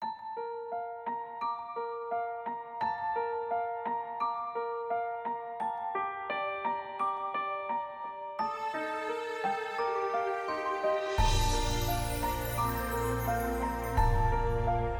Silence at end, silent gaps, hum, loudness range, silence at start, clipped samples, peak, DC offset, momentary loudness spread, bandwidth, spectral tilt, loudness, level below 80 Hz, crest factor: 0 s; none; none; 4 LU; 0 s; under 0.1%; -14 dBFS; under 0.1%; 8 LU; 19 kHz; -5 dB/octave; -33 LUFS; -40 dBFS; 18 dB